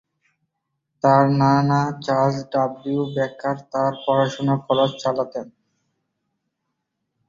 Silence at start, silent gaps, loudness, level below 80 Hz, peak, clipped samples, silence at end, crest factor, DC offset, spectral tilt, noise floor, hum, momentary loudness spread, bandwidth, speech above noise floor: 1.05 s; none; -21 LUFS; -60 dBFS; -2 dBFS; under 0.1%; 1.8 s; 20 dB; under 0.1%; -7 dB/octave; -78 dBFS; none; 9 LU; 7.4 kHz; 58 dB